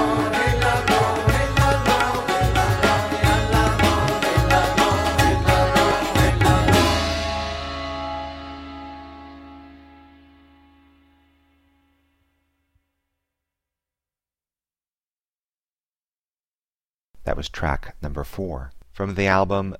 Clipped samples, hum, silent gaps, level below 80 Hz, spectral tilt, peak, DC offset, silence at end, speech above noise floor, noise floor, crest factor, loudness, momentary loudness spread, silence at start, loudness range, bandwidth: under 0.1%; none; 14.91-16.01 s, 16.08-16.80 s, 16.86-17.14 s; -32 dBFS; -5 dB/octave; -4 dBFS; under 0.1%; 0.05 s; over 66 dB; under -90 dBFS; 18 dB; -20 LUFS; 17 LU; 0 s; 16 LU; 16.5 kHz